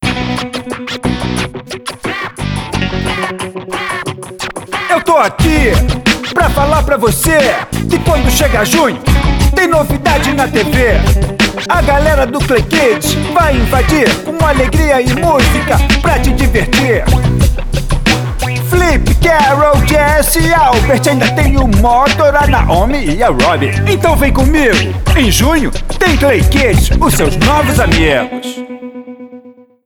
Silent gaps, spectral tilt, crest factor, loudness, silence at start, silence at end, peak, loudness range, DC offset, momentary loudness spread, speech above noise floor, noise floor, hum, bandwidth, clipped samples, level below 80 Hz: none; -5 dB/octave; 10 dB; -11 LUFS; 0 s; 0.35 s; 0 dBFS; 5 LU; under 0.1%; 10 LU; 27 dB; -37 dBFS; none; over 20 kHz; under 0.1%; -16 dBFS